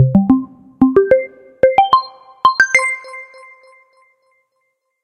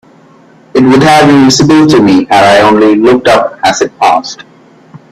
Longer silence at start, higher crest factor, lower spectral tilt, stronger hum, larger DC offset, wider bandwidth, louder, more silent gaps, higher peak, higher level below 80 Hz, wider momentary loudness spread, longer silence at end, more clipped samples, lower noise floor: second, 0 s vs 0.75 s; first, 16 dB vs 6 dB; about the same, -6 dB/octave vs -5 dB/octave; neither; neither; second, 11 kHz vs 13.5 kHz; second, -14 LUFS vs -6 LUFS; neither; about the same, 0 dBFS vs 0 dBFS; second, -48 dBFS vs -42 dBFS; first, 21 LU vs 6 LU; first, 1.8 s vs 0.15 s; second, under 0.1% vs 0.4%; first, -69 dBFS vs -39 dBFS